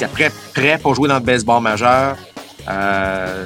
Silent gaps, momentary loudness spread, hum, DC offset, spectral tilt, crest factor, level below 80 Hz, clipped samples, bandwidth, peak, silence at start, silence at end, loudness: none; 11 LU; none; under 0.1%; -5 dB/octave; 16 dB; -44 dBFS; under 0.1%; 17 kHz; 0 dBFS; 0 s; 0 s; -16 LUFS